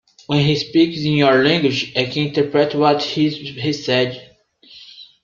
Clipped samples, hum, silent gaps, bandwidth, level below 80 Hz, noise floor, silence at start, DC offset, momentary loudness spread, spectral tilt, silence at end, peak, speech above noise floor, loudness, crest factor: under 0.1%; none; none; 7.4 kHz; -56 dBFS; -48 dBFS; 0.3 s; under 0.1%; 9 LU; -6 dB/octave; 0.2 s; -2 dBFS; 31 dB; -17 LUFS; 16 dB